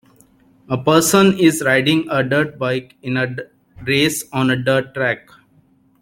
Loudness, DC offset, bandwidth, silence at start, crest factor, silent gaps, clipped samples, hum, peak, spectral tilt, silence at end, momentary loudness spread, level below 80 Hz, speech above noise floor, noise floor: -17 LUFS; under 0.1%; 16.5 kHz; 0.7 s; 18 dB; none; under 0.1%; none; 0 dBFS; -4.5 dB/octave; 0.85 s; 11 LU; -54 dBFS; 38 dB; -55 dBFS